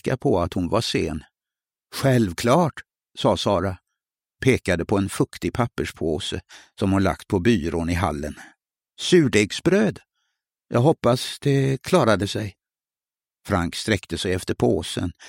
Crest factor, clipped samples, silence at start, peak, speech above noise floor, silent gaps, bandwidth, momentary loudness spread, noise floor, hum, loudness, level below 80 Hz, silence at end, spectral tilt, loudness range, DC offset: 20 dB; under 0.1%; 0.05 s; -2 dBFS; over 68 dB; none; 16.5 kHz; 10 LU; under -90 dBFS; none; -22 LUFS; -46 dBFS; 0 s; -5.5 dB/octave; 3 LU; under 0.1%